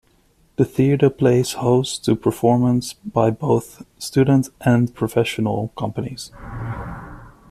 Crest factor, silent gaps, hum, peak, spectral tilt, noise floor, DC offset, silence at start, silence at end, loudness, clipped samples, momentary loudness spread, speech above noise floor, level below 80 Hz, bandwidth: 16 dB; none; none; -2 dBFS; -6.5 dB/octave; -58 dBFS; under 0.1%; 0.6 s; 0.2 s; -19 LUFS; under 0.1%; 16 LU; 39 dB; -46 dBFS; 14 kHz